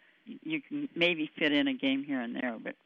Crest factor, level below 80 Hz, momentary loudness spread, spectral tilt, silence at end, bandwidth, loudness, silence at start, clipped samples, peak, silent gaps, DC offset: 18 dB; -82 dBFS; 10 LU; -6 dB/octave; 0.15 s; 6.6 kHz; -31 LUFS; 0.25 s; under 0.1%; -16 dBFS; none; under 0.1%